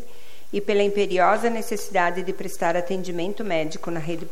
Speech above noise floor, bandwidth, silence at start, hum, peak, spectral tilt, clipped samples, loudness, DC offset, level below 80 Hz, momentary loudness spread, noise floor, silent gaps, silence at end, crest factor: 25 dB; 16.5 kHz; 0 s; none; -6 dBFS; -5 dB/octave; under 0.1%; -24 LUFS; 5%; -60 dBFS; 10 LU; -49 dBFS; none; 0 s; 18 dB